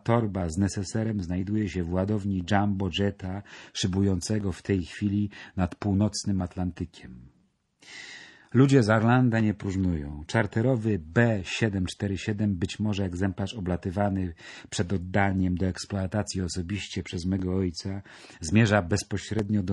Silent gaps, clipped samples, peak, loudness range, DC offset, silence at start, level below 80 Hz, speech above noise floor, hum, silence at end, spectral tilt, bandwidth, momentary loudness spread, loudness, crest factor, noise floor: none; under 0.1%; -6 dBFS; 5 LU; under 0.1%; 0.05 s; -50 dBFS; 39 dB; none; 0 s; -6 dB/octave; 11.5 kHz; 13 LU; -27 LUFS; 20 dB; -65 dBFS